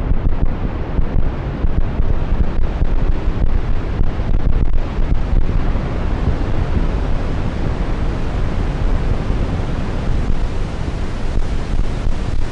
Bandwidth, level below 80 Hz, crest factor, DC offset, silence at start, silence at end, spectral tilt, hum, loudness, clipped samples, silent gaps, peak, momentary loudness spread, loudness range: 6.6 kHz; -18 dBFS; 14 dB; under 0.1%; 0 s; 0 s; -8 dB/octave; none; -22 LUFS; under 0.1%; none; -2 dBFS; 3 LU; 1 LU